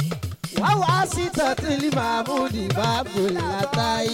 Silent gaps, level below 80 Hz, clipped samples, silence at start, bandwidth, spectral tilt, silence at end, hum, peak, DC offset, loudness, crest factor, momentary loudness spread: none; -44 dBFS; under 0.1%; 0 s; 17 kHz; -5 dB/octave; 0 s; none; -8 dBFS; under 0.1%; -23 LUFS; 14 dB; 4 LU